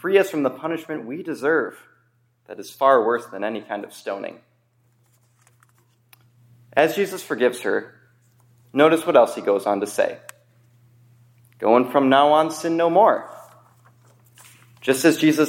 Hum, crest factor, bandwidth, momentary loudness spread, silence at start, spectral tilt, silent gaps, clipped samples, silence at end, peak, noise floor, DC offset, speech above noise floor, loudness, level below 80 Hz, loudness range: none; 20 dB; 16.5 kHz; 15 LU; 0.05 s; -4.5 dB/octave; none; under 0.1%; 0 s; -2 dBFS; -63 dBFS; under 0.1%; 44 dB; -20 LUFS; -76 dBFS; 8 LU